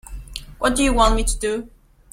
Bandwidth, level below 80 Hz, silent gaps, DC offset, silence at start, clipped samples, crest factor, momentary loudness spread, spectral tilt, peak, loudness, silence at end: 15.5 kHz; -26 dBFS; none; under 0.1%; 0.05 s; under 0.1%; 20 dB; 18 LU; -3.5 dB/octave; -2 dBFS; -20 LUFS; 0.45 s